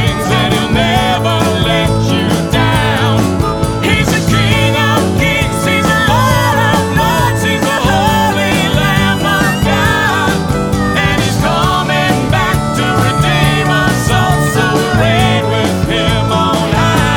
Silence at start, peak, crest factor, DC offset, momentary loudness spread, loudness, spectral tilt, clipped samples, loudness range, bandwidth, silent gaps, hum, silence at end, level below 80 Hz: 0 s; 0 dBFS; 12 dB; under 0.1%; 2 LU; -11 LUFS; -5 dB/octave; under 0.1%; 1 LU; 18 kHz; none; none; 0 s; -26 dBFS